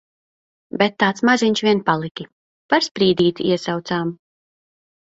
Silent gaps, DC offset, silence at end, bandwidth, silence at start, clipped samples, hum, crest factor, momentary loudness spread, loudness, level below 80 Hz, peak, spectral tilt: 2.11-2.15 s, 2.33-2.69 s; under 0.1%; 0.9 s; 8 kHz; 0.75 s; under 0.1%; none; 20 dB; 13 LU; -19 LUFS; -60 dBFS; 0 dBFS; -5 dB/octave